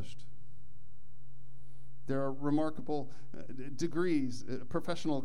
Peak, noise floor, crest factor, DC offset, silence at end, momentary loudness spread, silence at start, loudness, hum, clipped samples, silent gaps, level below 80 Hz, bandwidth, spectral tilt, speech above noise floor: -18 dBFS; -60 dBFS; 18 dB; 3%; 0 s; 18 LU; 0 s; -36 LUFS; none; under 0.1%; none; -66 dBFS; 12 kHz; -6.5 dB/octave; 25 dB